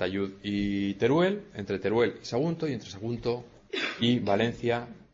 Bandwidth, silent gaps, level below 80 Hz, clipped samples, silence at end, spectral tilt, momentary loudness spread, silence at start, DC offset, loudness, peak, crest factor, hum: 7.8 kHz; none; -56 dBFS; under 0.1%; 0.1 s; -6.5 dB/octave; 10 LU; 0 s; under 0.1%; -29 LUFS; -12 dBFS; 16 dB; none